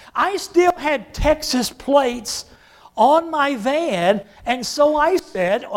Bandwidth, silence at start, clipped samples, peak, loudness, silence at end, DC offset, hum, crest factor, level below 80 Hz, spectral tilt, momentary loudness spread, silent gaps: 16.5 kHz; 0.15 s; under 0.1%; -2 dBFS; -19 LUFS; 0 s; under 0.1%; none; 16 dB; -38 dBFS; -4 dB/octave; 8 LU; none